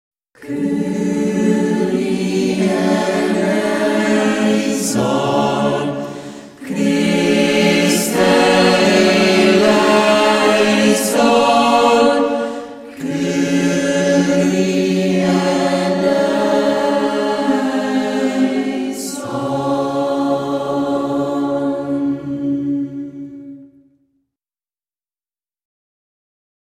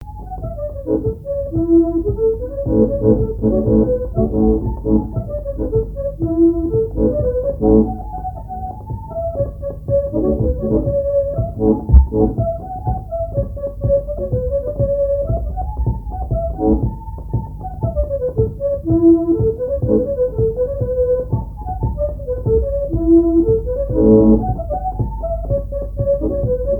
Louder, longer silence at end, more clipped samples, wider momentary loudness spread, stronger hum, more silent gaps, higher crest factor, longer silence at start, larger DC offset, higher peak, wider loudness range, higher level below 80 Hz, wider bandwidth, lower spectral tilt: first, -15 LUFS vs -18 LUFS; first, 3.05 s vs 0 s; neither; about the same, 11 LU vs 11 LU; neither; neither; about the same, 16 dB vs 16 dB; first, 0.4 s vs 0 s; neither; about the same, 0 dBFS vs 0 dBFS; first, 8 LU vs 5 LU; second, -54 dBFS vs -24 dBFS; first, 16 kHz vs 1.8 kHz; second, -4.5 dB/octave vs -13.5 dB/octave